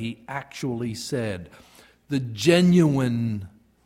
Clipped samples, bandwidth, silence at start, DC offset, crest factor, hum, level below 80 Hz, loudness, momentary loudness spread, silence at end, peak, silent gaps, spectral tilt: under 0.1%; 14.5 kHz; 0 s; under 0.1%; 18 dB; none; -58 dBFS; -23 LUFS; 17 LU; 0.35 s; -6 dBFS; none; -6 dB/octave